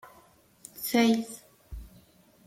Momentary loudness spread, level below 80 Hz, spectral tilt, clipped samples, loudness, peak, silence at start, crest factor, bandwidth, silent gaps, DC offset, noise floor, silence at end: 24 LU; -52 dBFS; -4 dB/octave; under 0.1%; -27 LUFS; -10 dBFS; 0.05 s; 22 dB; 16.5 kHz; none; under 0.1%; -60 dBFS; 0.6 s